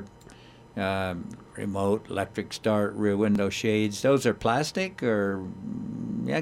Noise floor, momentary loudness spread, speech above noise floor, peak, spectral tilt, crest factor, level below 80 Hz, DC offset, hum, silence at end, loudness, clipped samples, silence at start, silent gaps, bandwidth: -50 dBFS; 12 LU; 23 dB; -10 dBFS; -5.5 dB/octave; 18 dB; -58 dBFS; under 0.1%; none; 0 s; -27 LUFS; under 0.1%; 0 s; none; 15.5 kHz